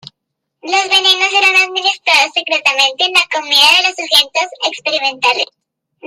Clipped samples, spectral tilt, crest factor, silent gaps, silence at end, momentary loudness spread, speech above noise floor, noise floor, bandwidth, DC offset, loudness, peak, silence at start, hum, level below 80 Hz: under 0.1%; 1 dB/octave; 14 dB; none; 0 s; 8 LU; 62 dB; -75 dBFS; 19.5 kHz; under 0.1%; -11 LUFS; 0 dBFS; 0.65 s; none; -64 dBFS